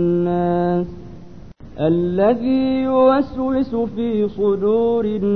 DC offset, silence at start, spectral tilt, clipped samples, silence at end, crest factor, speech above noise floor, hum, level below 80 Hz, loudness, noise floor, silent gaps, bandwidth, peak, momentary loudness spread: 0.9%; 0 s; -10 dB/octave; under 0.1%; 0 s; 14 dB; 22 dB; none; -44 dBFS; -18 LUFS; -39 dBFS; none; 6 kHz; -4 dBFS; 7 LU